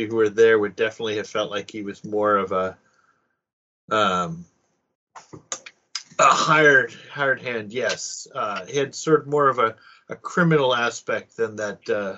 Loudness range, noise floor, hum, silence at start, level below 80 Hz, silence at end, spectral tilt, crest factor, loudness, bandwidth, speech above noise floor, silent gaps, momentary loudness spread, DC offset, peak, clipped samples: 6 LU; -67 dBFS; none; 0 s; -68 dBFS; 0 s; -3 dB/octave; 20 dB; -21 LUFS; 8 kHz; 45 dB; 3.53-3.88 s, 4.95-5.07 s; 17 LU; under 0.1%; -4 dBFS; under 0.1%